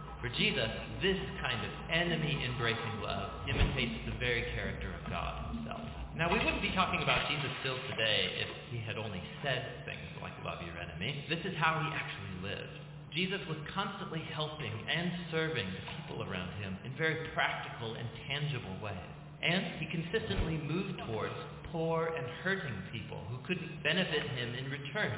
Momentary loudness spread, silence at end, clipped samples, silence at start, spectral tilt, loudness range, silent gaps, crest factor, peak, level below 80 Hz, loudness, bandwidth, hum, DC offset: 11 LU; 0 s; under 0.1%; 0 s; -3 dB/octave; 4 LU; none; 22 dB; -14 dBFS; -48 dBFS; -35 LUFS; 4 kHz; none; under 0.1%